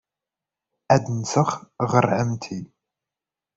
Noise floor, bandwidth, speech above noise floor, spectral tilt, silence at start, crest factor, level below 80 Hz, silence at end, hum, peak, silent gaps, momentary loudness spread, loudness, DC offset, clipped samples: -89 dBFS; 8 kHz; 67 dB; -6 dB/octave; 0.9 s; 22 dB; -58 dBFS; 0.9 s; none; -4 dBFS; none; 12 LU; -22 LUFS; under 0.1%; under 0.1%